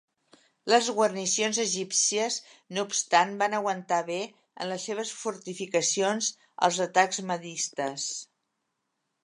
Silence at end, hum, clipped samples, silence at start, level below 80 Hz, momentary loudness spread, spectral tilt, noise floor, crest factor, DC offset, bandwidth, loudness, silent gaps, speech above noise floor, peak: 1 s; none; under 0.1%; 0.65 s; -84 dBFS; 11 LU; -2 dB/octave; -80 dBFS; 22 dB; under 0.1%; 11.5 kHz; -27 LUFS; none; 52 dB; -6 dBFS